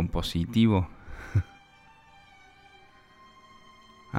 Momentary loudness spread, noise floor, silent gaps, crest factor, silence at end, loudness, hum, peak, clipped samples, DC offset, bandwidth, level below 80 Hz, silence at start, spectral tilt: 18 LU; -56 dBFS; none; 20 dB; 0 s; -27 LUFS; none; -10 dBFS; under 0.1%; under 0.1%; 15.5 kHz; -44 dBFS; 0 s; -7 dB/octave